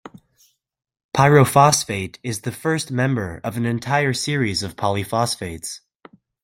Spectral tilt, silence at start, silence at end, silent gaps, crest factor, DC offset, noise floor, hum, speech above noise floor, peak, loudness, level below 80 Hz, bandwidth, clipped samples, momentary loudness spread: -4.5 dB/octave; 1.15 s; 0.65 s; none; 20 dB; under 0.1%; -61 dBFS; none; 41 dB; -2 dBFS; -20 LUFS; -54 dBFS; 16.5 kHz; under 0.1%; 14 LU